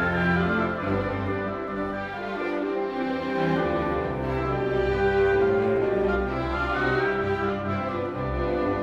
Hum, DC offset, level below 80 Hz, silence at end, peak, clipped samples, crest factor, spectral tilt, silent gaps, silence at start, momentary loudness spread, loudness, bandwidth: none; under 0.1%; -40 dBFS; 0 s; -12 dBFS; under 0.1%; 14 dB; -8 dB/octave; none; 0 s; 7 LU; -26 LUFS; 7.4 kHz